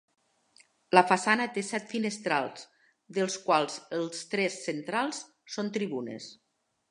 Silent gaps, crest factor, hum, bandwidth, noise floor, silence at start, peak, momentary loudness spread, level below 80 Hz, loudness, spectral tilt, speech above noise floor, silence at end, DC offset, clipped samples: none; 28 dB; none; 11 kHz; -64 dBFS; 0.9 s; -2 dBFS; 15 LU; -84 dBFS; -29 LUFS; -4 dB/octave; 34 dB; 0.55 s; under 0.1%; under 0.1%